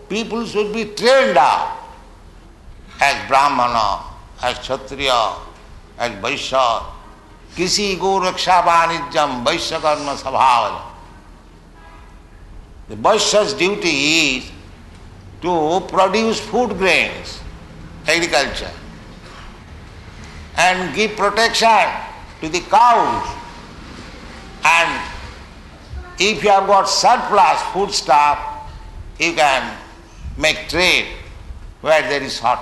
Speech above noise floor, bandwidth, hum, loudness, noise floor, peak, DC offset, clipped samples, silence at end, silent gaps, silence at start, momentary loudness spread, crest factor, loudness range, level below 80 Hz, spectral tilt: 26 dB; 12 kHz; none; -16 LUFS; -42 dBFS; -2 dBFS; under 0.1%; under 0.1%; 0 s; none; 0 s; 23 LU; 16 dB; 5 LU; -40 dBFS; -2.5 dB/octave